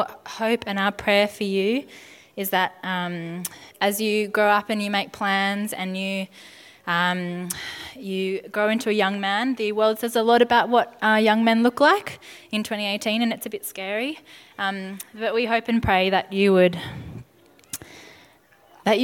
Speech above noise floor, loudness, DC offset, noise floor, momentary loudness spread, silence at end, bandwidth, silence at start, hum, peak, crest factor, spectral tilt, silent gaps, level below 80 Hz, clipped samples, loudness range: 32 dB; -22 LUFS; under 0.1%; -55 dBFS; 16 LU; 0 s; 19 kHz; 0 s; none; -4 dBFS; 18 dB; -4.5 dB/octave; none; -54 dBFS; under 0.1%; 6 LU